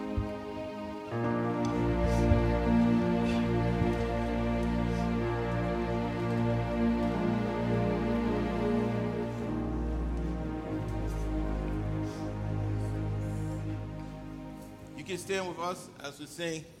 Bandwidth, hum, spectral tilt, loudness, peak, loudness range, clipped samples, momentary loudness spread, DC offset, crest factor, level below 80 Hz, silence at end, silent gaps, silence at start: 13.5 kHz; none; -7.5 dB/octave; -32 LUFS; -12 dBFS; 8 LU; under 0.1%; 12 LU; under 0.1%; 20 dB; -40 dBFS; 0.05 s; none; 0 s